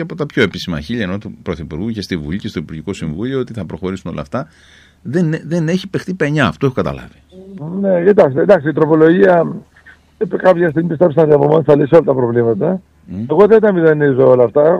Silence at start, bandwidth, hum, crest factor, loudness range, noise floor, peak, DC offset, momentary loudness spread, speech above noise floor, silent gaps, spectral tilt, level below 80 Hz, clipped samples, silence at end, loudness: 0 s; 9.8 kHz; none; 14 dB; 10 LU; -45 dBFS; 0 dBFS; under 0.1%; 15 LU; 31 dB; none; -7.5 dB/octave; -44 dBFS; under 0.1%; 0 s; -14 LUFS